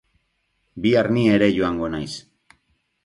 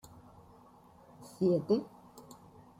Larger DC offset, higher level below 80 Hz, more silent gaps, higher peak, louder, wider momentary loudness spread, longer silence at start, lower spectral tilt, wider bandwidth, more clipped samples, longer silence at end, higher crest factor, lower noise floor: neither; first, -50 dBFS vs -70 dBFS; neither; first, -4 dBFS vs -16 dBFS; first, -20 LUFS vs -32 LUFS; second, 14 LU vs 25 LU; second, 0.75 s vs 1.2 s; second, -6.5 dB/octave vs -8 dB/octave; second, 11.5 kHz vs 16 kHz; neither; first, 0.85 s vs 0.6 s; about the same, 18 dB vs 20 dB; first, -70 dBFS vs -59 dBFS